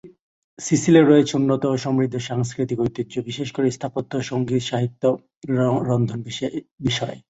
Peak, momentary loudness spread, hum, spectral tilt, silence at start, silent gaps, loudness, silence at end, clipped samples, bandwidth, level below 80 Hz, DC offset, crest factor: -2 dBFS; 12 LU; none; -6 dB/octave; 0.05 s; 0.20-0.57 s, 5.36-5.41 s, 6.71-6.78 s; -21 LUFS; 0.1 s; under 0.1%; 8.2 kHz; -56 dBFS; under 0.1%; 18 dB